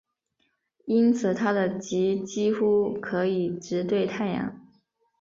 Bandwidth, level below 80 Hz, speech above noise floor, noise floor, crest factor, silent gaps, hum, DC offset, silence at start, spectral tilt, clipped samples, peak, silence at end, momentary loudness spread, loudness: 7.6 kHz; -66 dBFS; 49 dB; -74 dBFS; 16 dB; none; none; under 0.1%; 0.85 s; -6.5 dB/octave; under 0.1%; -10 dBFS; 0.6 s; 7 LU; -26 LUFS